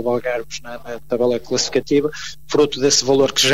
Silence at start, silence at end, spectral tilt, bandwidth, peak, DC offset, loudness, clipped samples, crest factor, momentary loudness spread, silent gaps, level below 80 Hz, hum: 0 s; 0 s; -3 dB/octave; 15.5 kHz; -4 dBFS; 2%; -18 LUFS; under 0.1%; 14 dB; 16 LU; none; -50 dBFS; none